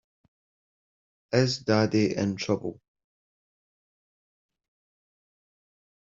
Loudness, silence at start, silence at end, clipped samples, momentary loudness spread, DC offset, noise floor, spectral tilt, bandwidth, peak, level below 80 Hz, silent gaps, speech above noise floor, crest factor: -26 LUFS; 1.3 s; 3.35 s; under 0.1%; 6 LU; under 0.1%; under -90 dBFS; -6 dB/octave; 7.8 kHz; -8 dBFS; -68 dBFS; none; over 65 dB; 24 dB